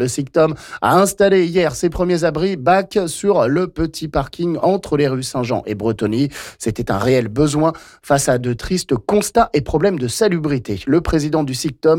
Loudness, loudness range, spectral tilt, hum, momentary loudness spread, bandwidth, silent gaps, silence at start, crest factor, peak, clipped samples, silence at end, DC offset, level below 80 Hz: -17 LUFS; 3 LU; -5.5 dB/octave; none; 7 LU; 17 kHz; none; 0 s; 12 dB; -4 dBFS; under 0.1%; 0 s; under 0.1%; -38 dBFS